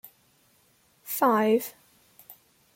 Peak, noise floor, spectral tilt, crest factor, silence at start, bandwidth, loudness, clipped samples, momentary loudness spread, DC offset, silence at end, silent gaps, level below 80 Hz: -10 dBFS; -64 dBFS; -4.5 dB/octave; 18 dB; 0.05 s; 17 kHz; -25 LUFS; under 0.1%; 19 LU; under 0.1%; 0.45 s; none; -76 dBFS